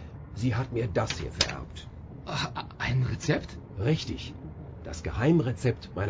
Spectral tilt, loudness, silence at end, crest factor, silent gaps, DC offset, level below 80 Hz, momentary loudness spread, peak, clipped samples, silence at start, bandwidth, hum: -5.5 dB/octave; -30 LUFS; 0 s; 26 dB; none; under 0.1%; -44 dBFS; 17 LU; -4 dBFS; under 0.1%; 0 s; 8 kHz; none